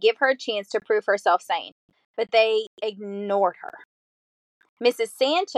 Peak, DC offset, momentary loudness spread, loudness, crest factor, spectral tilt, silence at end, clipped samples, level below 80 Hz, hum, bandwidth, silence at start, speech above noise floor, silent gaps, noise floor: -6 dBFS; under 0.1%; 12 LU; -24 LUFS; 18 dB; -3 dB/octave; 0 s; under 0.1%; -84 dBFS; none; 13 kHz; 0 s; over 67 dB; 1.72-1.89 s, 2.05-2.14 s, 2.67-2.77 s, 3.85-4.60 s, 4.69-4.77 s; under -90 dBFS